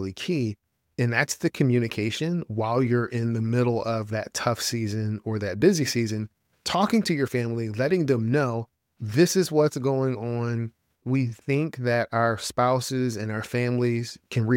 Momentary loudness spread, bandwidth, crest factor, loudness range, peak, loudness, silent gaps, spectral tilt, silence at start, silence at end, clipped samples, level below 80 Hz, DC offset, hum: 8 LU; 17 kHz; 18 dB; 2 LU; -6 dBFS; -25 LUFS; none; -5.5 dB/octave; 0 s; 0 s; under 0.1%; -62 dBFS; under 0.1%; none